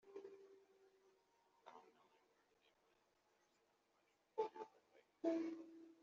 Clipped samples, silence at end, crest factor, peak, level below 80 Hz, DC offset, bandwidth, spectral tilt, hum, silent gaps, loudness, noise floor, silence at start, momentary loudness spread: under 0.1%; 0.1 s; 22 dB; -30 dBFS; under -90 dBFS; under 0.1%; 7.4 kHz; -4 dB/octave; none; none; -49 LUFS; -82 dBFS; 0.05 s; 22 LU